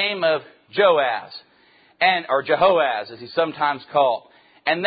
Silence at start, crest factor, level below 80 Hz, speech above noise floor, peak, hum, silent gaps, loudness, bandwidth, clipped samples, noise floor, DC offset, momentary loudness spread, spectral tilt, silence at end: 0 s; 16 dB; -64 dBFS; 36 dB; -4 dBFS; none; none; -20 LUFS; 5 kHz; under 0.1%; -56 dBFS; under 0.1%; 12 LU; -8.5 dB/octave; 0 s